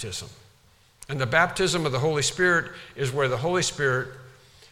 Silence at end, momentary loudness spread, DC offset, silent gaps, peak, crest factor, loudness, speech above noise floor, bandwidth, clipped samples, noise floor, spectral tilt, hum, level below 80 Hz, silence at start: 0.45 s; 14 LU; under 0.1%; none; -6 dBFS; 20 dB; -24 LUFS; 34 dB; 16 kHz; under 0.1%; -59 dBFS; -4 dB/octave; none; -54 dBFS; 0 s